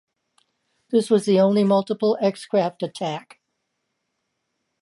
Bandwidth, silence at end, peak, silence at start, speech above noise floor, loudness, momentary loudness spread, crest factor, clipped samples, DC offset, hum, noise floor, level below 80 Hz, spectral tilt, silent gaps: 11.5 kHz; 1.65 s; -6 dBFS; 0.9 s; 56 dB; -21 LUFS; 11 LU; 16 dB; under 0.1%; under 0.1%; none; -77 dBFS; -74 dBFS; -6.5 dB/octave; none